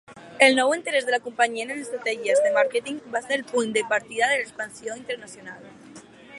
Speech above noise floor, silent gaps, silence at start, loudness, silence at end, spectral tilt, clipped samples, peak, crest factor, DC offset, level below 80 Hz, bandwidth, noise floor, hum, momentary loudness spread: 22 dB; none; 0.1 s; -23 LUFS; 0 s; -2 dB/octave; under 0.1%; -2 dBFS; 22 dB; under 0.1%; -72 dBFS; 11.5 kHz; -46 dBFS; none; 16 LU